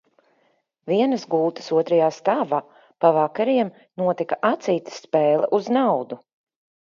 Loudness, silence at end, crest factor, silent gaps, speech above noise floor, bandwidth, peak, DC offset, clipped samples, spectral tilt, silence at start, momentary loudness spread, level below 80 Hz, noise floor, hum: -21 LUFS; 0.75 s; 20 dB; none; 45 dB; 7.4 kHz; -2 dBFS; under 0.1%; under 0.1%; -6.5 dB/octave; 0.85 s; 7 LU; -76 dBFS; -66 dBFS; none